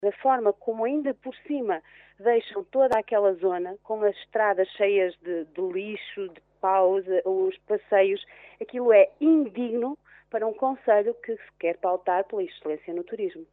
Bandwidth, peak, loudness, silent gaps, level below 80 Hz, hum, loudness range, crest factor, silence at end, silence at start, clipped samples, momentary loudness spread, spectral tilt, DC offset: 5 kHz; -6 dBFS; -25 LUFS; none; -72 dBFS; none; 4 LU; 18 dB; 0.1 s; 0 s; under 0.1%; 12 LU; -3 dB/octave; under 0.1%